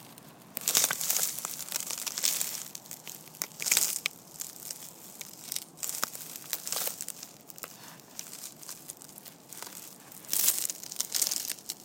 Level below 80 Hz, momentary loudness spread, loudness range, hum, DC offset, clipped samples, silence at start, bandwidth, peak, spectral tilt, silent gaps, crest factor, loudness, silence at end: -80 dBFS; 19 LU; 8 LU; none; under 0.1%; under 0.1%; 0 s; 17 kHz; 0 dBFS; 1 dB/octave; none; 34 dB; -30 LUFS; 0 s